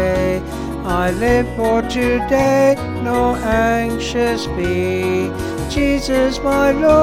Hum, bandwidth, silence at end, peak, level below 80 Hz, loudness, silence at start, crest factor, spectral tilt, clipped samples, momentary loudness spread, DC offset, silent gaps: none; 16 kHz; 0 s; -2 dBFS; -30 dBFS; -17 LUFS; 0 s; 14 dB; -5.5 dB/octave; under 0.1%; 6 LU; under 0.1%; none